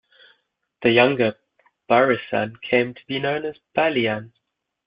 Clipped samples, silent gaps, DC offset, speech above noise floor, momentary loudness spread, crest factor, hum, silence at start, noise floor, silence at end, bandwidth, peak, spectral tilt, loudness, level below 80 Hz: under 0.1%; none; under 0.1%; 55 dB; 10 LU; 20 dB; none; 0.8 s; -76 dBFS; 0.6 s; 5.4 kHz; -2 dBFS; -9.5 dB/octave; -21 LUFS; -62 dBFS